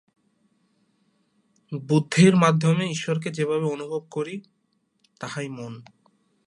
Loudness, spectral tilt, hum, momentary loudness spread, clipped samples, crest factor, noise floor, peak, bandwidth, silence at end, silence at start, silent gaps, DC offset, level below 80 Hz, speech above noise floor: -23 LUFS; -6 dB/octave; none; 20 LU; under 0.1%; 20 dB; -68 dBFS; -4 dBFS; 11.5 kHz; 0.65 s; 1.7 s; none; under 0.1%; -68 dBFS; 46 dB